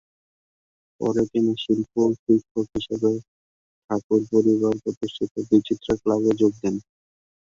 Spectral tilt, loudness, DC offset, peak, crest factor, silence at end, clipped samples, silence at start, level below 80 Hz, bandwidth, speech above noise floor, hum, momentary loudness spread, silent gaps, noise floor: -7 dB/octave; -23 LUFS; under 0.1%; -4 dBFS; 18 dB; 0.75 s; under 0.1%; 1 s; -56 dBFS; 7.6 kHz; over 68 dB; none; 9 LU; 2.19-2.26 s, 2.51-2.55 s, 3.28-3.88 s, 4.04-4.10 s, 4.97-5.01 s, 5.31-5.35 s; under -90 dBFS